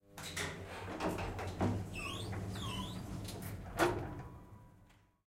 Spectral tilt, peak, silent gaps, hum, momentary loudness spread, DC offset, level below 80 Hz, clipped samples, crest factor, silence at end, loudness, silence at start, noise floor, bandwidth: -5 dB/octave; -16 dBFS; none; none; 13 LU; under 0.1%; -54 dBFS; under 0.1%; 24 dB; 0.35 s; -40 LUFS; 0.05 s; -65 dBFS; 16 kHz